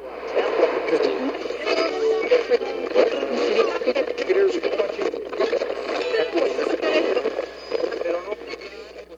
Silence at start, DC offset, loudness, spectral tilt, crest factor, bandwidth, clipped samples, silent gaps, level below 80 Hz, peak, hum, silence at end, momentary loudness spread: 0 s; under 0.1%; -23 LUFS; -3.5 dB/octave; 18 dB; 7.8 kHz; under 0.1%; none; -58 dBFS; -4 dBFS; none; 0 s; 8 LU